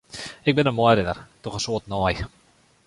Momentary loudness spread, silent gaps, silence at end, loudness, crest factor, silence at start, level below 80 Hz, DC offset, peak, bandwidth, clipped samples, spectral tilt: 15 LU; none; 0.6 s; -23 LUFS; 20 dB; 0.15 s; -44 dBFS; under 0.1%; -4 dBFS; 11.5 kHz; under 0.1%; -5.5 dB/octave